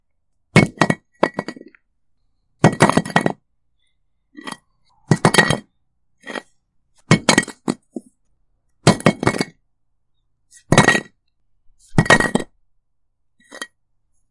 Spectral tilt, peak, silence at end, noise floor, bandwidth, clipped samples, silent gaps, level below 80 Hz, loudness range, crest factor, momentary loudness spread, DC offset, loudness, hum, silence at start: -4.5 dB/octave; 0 dBFS; 0.65 s; -72 dBFS; 11.5 kHz; under 0.1%; none; -46 dBFS; 3 LU; 20 dB; 21 LU; under 0.1%; -17 LUFS; none; 0.55 s